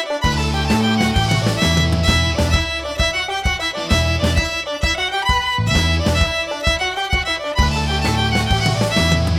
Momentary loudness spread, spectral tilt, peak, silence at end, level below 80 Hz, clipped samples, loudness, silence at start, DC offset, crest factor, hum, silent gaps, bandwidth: 4 LU; -4.5 dB/octave; -2 dBFS; 0 s; -24 dBFS; under 0.1%; -17 LUFS; 0 s; under 0.1%; 16 dB; none; none; 16 kHz